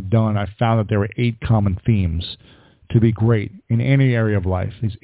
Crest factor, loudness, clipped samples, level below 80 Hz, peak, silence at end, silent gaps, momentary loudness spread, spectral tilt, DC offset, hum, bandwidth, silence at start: 14 dB; -19 LUFS; under 0.1%; -34 dBFS; -4 dBFS; 0.1 s; none; 7 LU; -12 dB/octave; under 0.1%; none; 4 kHz; 0 s